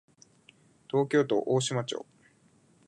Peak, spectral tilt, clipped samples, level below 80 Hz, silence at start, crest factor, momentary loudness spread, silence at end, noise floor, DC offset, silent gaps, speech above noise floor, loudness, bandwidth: -12 dBFS; -5 dB/octave; under 0.1%; -78 dBFS; 0.95 s; 18 dB; 10 LU; 0.9 s; -64 dBFS; under 0.1%; none; 36 dB; -29 LUFS; 10.5 kHz